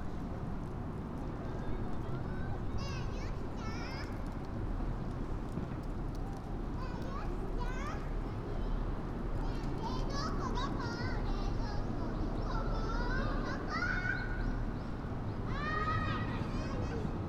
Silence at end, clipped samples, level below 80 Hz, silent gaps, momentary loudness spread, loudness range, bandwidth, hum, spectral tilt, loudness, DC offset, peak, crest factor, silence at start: 0 s; under 0.1%; -40 dBFS; none; 6 LU; 4 LU; 7.8 kHz; none; -7 dB/octave; -39 LUFS; under 0.1%; -22 dBFS; 14 dB; 0 s